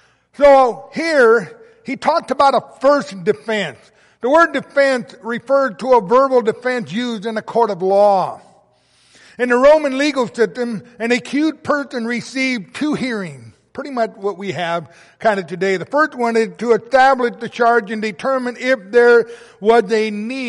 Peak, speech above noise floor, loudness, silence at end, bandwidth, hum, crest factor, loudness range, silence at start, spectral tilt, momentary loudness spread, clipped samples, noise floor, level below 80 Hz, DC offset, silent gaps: -2 dBFS; 39 dB; -16 LUFS; 0 s; 11.5 kHz; none; 14 dB; 6 LU; 0.4 s; -5 dB/octave; 12 LU; under 0.1%; -55 dBFS; -54 dBFS; under 0.1%; none